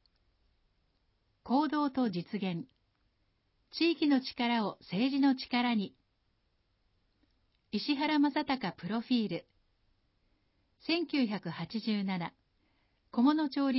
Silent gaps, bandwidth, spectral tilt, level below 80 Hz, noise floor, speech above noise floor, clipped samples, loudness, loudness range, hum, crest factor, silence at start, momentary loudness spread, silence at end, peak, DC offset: none; 5.8 kHz; -9 dB/octave; -74 dBFS; -76 dBFS; 45 dB; under 0.1%; -32 LUFS; 4 LU; none; 18 dB; 1.45 s; 10 LU; 0 s; -16 dBFS; under 0.1%